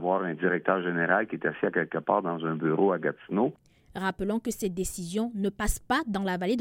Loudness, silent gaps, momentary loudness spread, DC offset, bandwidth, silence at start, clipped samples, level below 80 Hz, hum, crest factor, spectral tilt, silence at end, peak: -28 LUFS; none; 6 LU; under 0.1%; 16.5 kHz; 0 s; under 0.1%; -46 dBFS; none; 20 dB; -5.5 dB/octave; 0 s; -8 dBFS